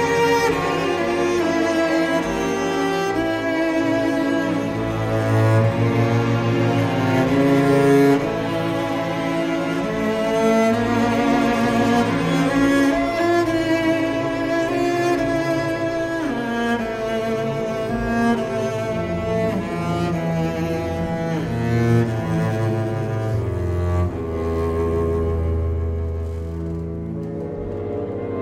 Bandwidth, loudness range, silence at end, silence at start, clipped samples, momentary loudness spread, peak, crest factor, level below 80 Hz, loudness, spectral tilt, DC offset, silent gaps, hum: 15.5 kHz; 5 LU; 0 s; 0 s; under 0.1%; 7 LU; -6 dBFS; 14 dB; -38 dBFS; -20 LUFS; -6.5 dB/octave; under 0.1%; none; none